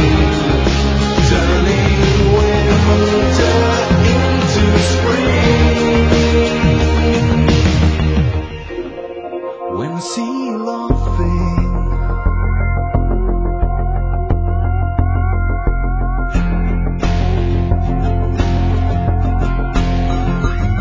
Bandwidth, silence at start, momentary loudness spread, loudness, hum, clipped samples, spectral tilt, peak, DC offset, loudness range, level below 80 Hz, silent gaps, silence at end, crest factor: 8 kHz; 0 s; 8 LU; -15 LUFS; none; under 0.1%; -6.5 dB/octave; 0 dBFS; under 0.1%; 6 LU; -18 dBFS; none; 0 s; 14 dB